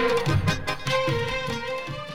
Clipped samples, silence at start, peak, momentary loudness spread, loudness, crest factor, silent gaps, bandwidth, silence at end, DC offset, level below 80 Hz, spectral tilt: under 0.1%; 0 s; -10 dBFS; 7 LU; -26 LUFS; 16 dB; none; 16 kHz; 0 s; under 0.1%; -42 dBFS; -5 dB/octave